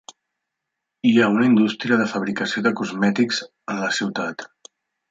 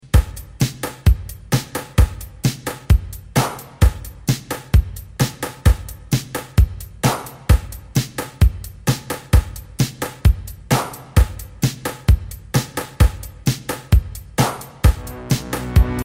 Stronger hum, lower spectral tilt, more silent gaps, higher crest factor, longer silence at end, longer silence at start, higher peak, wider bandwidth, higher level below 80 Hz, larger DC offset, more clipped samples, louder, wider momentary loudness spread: neither; about the same, -5 dB/octave vs -5.5 dB/octave; neither; about the same, 18 dB vs 18 dB; first, 0.65 s vs 0 s; first, 1.05 s vs 0.15 s; second, -4 dBFS vs 0 dBFS; second, 7.8 kHz vs 16.5 kHz; second, -66 dBFS vs -22 dBFS; neither; neither; about the same, -20 LUFS vs -21 LUFS; first, 12 LU vs 6 LU